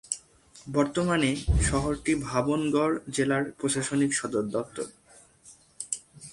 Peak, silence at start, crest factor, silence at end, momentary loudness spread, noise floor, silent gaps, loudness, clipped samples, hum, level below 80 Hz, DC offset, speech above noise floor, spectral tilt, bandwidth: -10 dBFS; 0.1 s; 18 dB; 0 s; 10 LU; -55 dBFS; none; -28 LUFS; under 0.1%; none; -38 dBFS; under 0.1%; 29 dB; -4.5 dB/octave; 11.5 kHz